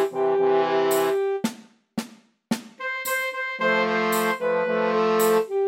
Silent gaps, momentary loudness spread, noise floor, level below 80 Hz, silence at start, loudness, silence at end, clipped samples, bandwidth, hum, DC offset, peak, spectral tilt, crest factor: none; 11 LU; -45 dBFS; -78 dBFS; 0 s; -23 LUFS; 0 s; under 0.1%; 16.5 kHz; none; under 0.1%; -8 dBFS; -4 dB/octave; 16 dB